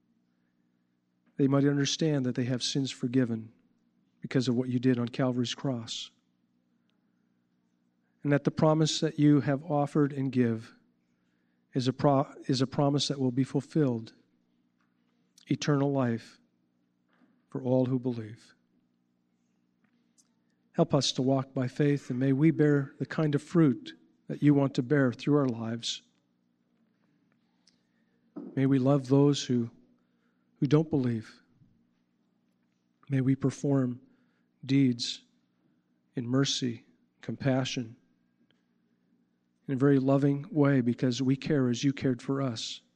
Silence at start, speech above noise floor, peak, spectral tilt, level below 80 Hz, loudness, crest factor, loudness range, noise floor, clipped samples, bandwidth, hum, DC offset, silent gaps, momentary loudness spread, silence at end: 1.4 s; 47 dB; -10 dBFS; -6 dB/octave; -72 dBFS; -28 LUFS; 20 dB; 7 LU; -74 dBFS; under 0.1%; 9.4 kHz; 60 Hz at -60 dBFS; under 0.1%; none; 13 LU; 0.2 s